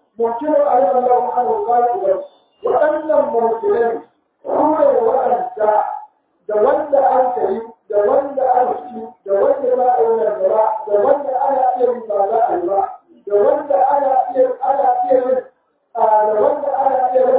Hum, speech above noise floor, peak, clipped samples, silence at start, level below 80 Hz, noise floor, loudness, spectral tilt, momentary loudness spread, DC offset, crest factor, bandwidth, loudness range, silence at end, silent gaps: none; 27 dB; -2 dBFS; under 0.1%; 0.2 s; -62 dBFS; -42 dBFS; -16 LUFS; -9.5 dB/octave; 8 LU; under 0.1%; 14 dB; 4 kHz; 1 LU; 0 s; none